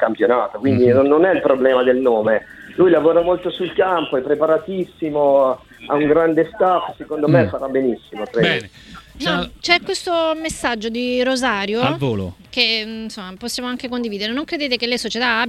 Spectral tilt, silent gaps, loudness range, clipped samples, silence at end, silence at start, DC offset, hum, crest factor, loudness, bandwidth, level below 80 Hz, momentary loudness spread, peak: -5 dB/octave; none; 5 LU; under 0.1%; 0 s; 0 s; under 0.1%; none; 18 dB; -18 LUFS; 13.5 kHz; -50 dBFS; 10 LU; 0 dBFS